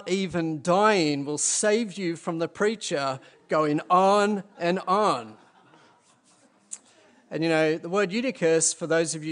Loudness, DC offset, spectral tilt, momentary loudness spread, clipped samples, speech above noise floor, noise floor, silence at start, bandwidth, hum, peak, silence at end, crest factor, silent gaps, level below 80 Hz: -24 LUFS; under 0.1%; -4 dB/octave; 10 LU; under 0.1%; 36 dB; -61 dBFS; 0 s; 10.5 kHz; none; -6 dBFS; 0 s; 18 dB; none; -70 dBFS